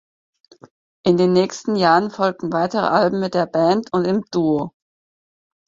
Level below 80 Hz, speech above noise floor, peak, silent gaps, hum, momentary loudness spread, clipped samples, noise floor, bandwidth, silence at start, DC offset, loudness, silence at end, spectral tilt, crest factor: -60 dBFS; over 72 dB; -2 dBFS; none; none; 6 LU; under 0.1%; under -90 dBFS; 7.6 kHz; 1.05 s; under 0.1%; -19 LUFS; 1 s; -6 dB/octave; 18 dB